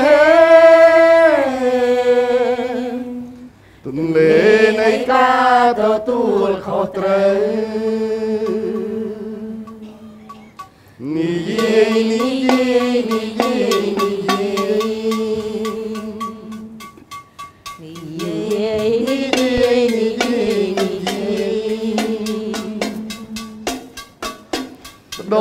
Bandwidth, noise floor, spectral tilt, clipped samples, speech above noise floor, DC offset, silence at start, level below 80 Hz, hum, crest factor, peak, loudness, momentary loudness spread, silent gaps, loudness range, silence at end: 16 kHz; -40 dBFS; -5 dB/octave; under 0.1%; 24 dB; under 0.1%; 0 s; -50 dBFS; none; 16 dB; 0 dBFS; -16 LUFS; 21 LU; none; 11 LU; 0 s